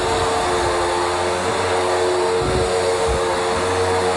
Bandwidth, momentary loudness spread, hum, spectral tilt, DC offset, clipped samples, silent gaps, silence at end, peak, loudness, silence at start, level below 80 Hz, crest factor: 11.5 kHz; 1 LU; none; -4 dB/octave; under 0.1%; under 0.1%; none; 0 s; -6 dBFS; -19 LUFS; 0 s; -36 dBFS; 12 dB